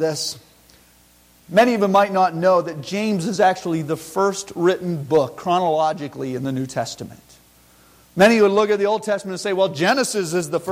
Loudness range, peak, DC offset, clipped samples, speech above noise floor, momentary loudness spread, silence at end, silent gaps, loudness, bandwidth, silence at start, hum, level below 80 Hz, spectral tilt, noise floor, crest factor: 3 LU; -4 dBFS; under 0.1%; under 0.1%; 34 dB; 11 LU; 0 s; none; -19 LUFS; 16.5 kHz; 0 s; 60 Hz at -50 dBFS; -60 dBFS; -5 dB/octave; -53 dBFS; 16 dB